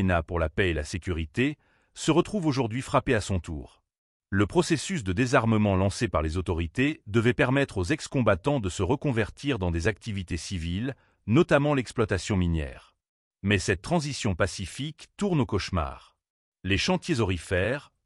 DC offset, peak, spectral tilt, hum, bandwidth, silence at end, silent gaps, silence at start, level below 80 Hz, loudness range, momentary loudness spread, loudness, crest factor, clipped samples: under 0.1%; -8 dBFS; -5.5 dB/octave; none; 12 kHz; 0.2 s; 3.98-4.20 s, 13.09-13.31 s, 16.30-16.52 s; 0 s; -42 dBFS; 3 LU; 9 LU; -27 LUFS; 18 dB; under 0.1%